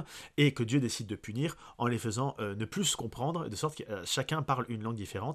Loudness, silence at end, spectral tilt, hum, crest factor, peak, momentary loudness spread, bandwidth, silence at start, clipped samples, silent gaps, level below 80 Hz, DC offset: -33 LUFS; 0 s; -4.5 dB/octave; none; 20 dB; -12 dBFS; 9 LU; 14.5 kHz; 0 s; under 0.1%; none; -62 dBFS; under 0.1%